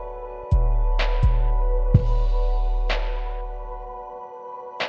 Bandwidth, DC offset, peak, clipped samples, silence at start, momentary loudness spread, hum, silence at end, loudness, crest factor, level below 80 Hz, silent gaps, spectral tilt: 5.8 kHz; under 0.1%; -2 dBFS; under 0.1%; 0 s; 15 LU; none; 0 s; -25 LUFS; 18 dB; -22 dBFS; none; -7.5 dB/octave